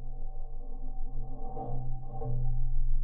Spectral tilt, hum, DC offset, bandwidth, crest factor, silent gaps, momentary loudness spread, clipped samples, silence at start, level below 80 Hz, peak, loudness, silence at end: -12 dB/octave; none; under 0.1%; 1.2 kHz; 10 dB; none; 10 LU; under 0.1%; 0 s; -30 dBFS; -16 dBFS; -40 LUFS; 0 s